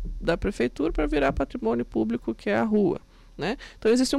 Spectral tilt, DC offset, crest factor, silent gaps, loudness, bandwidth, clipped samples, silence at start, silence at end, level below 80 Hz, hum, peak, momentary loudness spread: -5.5 dB/octave; under 0.1%; 14 dB; none; -26 LUFS; 13 kHz; under 0.1%; 0 s; 0 s; -38 dBFS; none; -10 dBFS; 8 LU